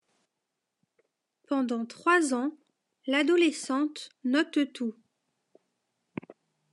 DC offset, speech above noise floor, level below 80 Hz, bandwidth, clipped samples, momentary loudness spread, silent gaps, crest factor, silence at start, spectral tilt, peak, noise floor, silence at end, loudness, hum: under 0.1%; 57 dB; -88 dBFS; 11.5 kHz; under 0.1%; 18 LU; none; 20 dB; 1.5 s; -3 dB/octave; -10 dBFS; -84 dBFS; 1.8 s; -28 LUFS; none